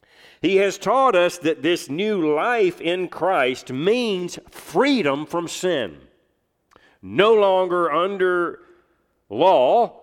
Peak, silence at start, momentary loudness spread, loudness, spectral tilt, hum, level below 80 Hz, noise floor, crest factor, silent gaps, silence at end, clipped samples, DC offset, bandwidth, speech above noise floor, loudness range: -2 dBFS; 0.45 s; 10 LU; -20 LUFS; -4.5 dB/octave; none; -64 dBFS; -69 dBFS; 18 dB; none; 0.1 s; under 0.1%; under 0.1%; 15.5 kHz; 49 dB; 4 LU